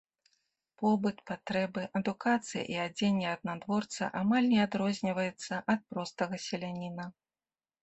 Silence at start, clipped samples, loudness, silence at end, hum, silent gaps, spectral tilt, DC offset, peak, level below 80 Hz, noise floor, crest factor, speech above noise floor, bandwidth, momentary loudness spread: 0.8 s; under 0.1%; -33 LUFS; 0.7 s; none; none; -5.5 dB/octave; under 0.1%; -14 dBFS; -72 dBFS; under -90 dBFS; 18 dB; over 58 dB; 8.4 kHz; 10 LU